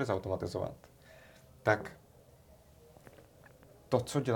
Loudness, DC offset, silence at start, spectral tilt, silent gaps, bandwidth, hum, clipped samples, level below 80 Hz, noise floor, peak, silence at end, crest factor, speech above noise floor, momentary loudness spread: -35 LUFS; under 0.1%; 0 s; -6 dB/octave; none; 18 kHz; none; under 0.1%; -64 dBFS; -60 dBFS; -12 dBFS; 0 s; 26 dB; 27 dB; 26 LU